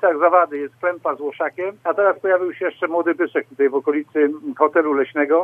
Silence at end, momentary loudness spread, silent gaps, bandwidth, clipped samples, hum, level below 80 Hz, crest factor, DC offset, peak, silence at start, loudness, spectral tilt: 0 s; 8 LU; none; 3.6 kHz; under 0.1%; none; -80 dBFS; 18 dB; under 0.1%; -2 dBFS; 0 s; -20 LUFS; -7 dB/octave